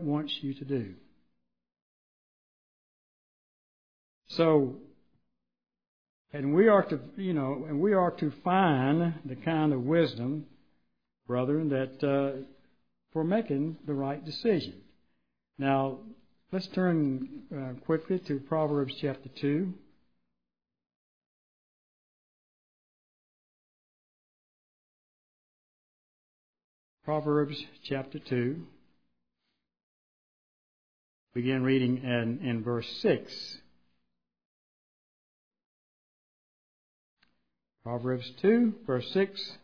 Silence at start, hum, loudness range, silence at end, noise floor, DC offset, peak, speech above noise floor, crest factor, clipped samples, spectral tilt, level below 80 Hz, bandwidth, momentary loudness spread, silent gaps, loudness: 0 s; none; 11 LU; 0.05 s; -90 dBFS; under 0.1%; -10 dBFS; 61 dB; 22 dB; under 0.1%; -8.5 dB/octave; -74 dBFS; 5.4 kHz; 14 LU; 1.82-4.22 s, 5.88-6.25 s, 20.96-26.54 s, 26.64-26.98 s, 29.83-31.27 s, 34.45-35.51 s, 35.66-37.17 s; -30 LUFS